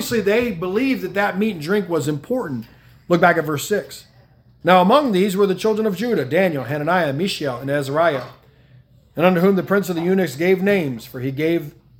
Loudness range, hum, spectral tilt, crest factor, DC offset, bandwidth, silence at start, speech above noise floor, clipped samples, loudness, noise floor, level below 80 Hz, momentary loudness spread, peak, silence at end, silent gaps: 3 LU; none; -6 dB/octave; 20 dB; under 0.1%; 18 kHz; 0 s; 33 dB; under 0.1%; -19 LUFS; -51 dBFS; -56 dBFS; 9 LU; 0 dBFS; 0.3 s; none